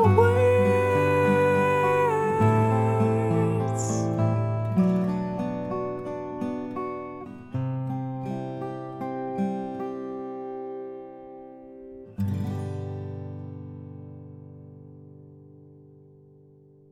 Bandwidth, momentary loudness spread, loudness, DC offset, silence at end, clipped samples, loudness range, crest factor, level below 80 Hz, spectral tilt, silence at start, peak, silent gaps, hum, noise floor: 12.5 kHz; 22 LU; -26 LUFS; under 0.1%; 1.1 s; under 0.1%; 16 LU; 20 dB; -58 dBFS; -7.5 dB/octave; 0 s; -6 dBFS; none; none; -54 dBFS